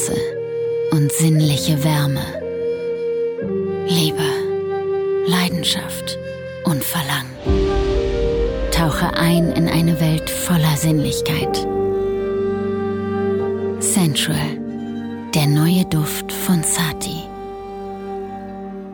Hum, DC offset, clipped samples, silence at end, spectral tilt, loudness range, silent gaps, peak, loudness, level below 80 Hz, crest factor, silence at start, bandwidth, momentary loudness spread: none; under 0.1%; under 0.1%; 0 s; -5 dB/octave; 3 LU; none; -4 dBFS; -19 LUFS; -32 dBFS; 16 dB; 0 s; 19 kHz; 11 LU